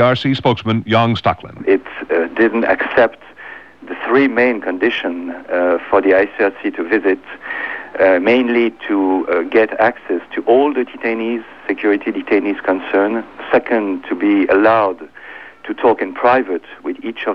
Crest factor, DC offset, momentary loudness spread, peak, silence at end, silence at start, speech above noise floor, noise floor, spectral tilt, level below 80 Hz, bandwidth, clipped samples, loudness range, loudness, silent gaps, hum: 16 dB; 0.3%; 12 LU; 0 dBFS; 0 s; 0 s; 21 dB; -36 dBFS; -8 dB/octave; -52 dBFS; 6.8 kHz; under 0.1%; 2 LU; -16 LUFS; none; none